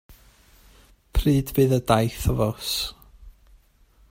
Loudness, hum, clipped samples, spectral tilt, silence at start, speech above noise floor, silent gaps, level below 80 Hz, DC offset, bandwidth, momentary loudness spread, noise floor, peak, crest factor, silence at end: -23 LUFS; none; under 0.1%; -6 dB/octave; 0.1 s; 35 dB; none; -36 dBFS; under 0.1%; 16.5 kHz; 7 LU; -57 dBFS; -4 dBFS; 22 dB; 0.8 s